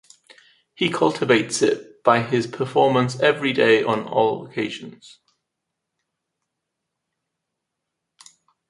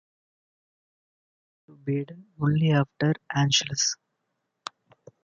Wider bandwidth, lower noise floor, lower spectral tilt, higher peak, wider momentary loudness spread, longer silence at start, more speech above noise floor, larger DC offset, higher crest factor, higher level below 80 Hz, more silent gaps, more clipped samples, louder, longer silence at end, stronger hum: first, 11.5 kHz vs 7.6 kHz; about the same, -81 dBFS vs -79 dBFS; about the same, -4.5 dB/octave vs -4 dB/octave; first, -2 dBFS vs -8 dBFS; second, 10 LU vs 19 LU; second, 0.8 s vs 1.85 s; first, 61 dB vs 54 dB; neither; about the same, 22 dB vs 20 dB; about the same, -66 dBFS vs -64 dBFS; neither; neither; first, -20 LUFS vs -25 LUFS; first, 3.6 s vs 1.3 s; neither